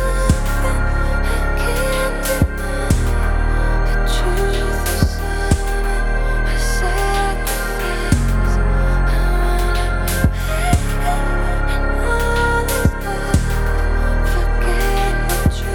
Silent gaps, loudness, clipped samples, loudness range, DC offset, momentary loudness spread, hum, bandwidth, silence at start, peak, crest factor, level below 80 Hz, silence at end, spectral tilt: none; -19 LUFS; under 0.1%; 1 LU; under 0.1%; 3 LU; none; 17.5 kHz; 0 s; 0 dBFS; 16 dB; -18 dBFS; 0 s; -5 dB/octave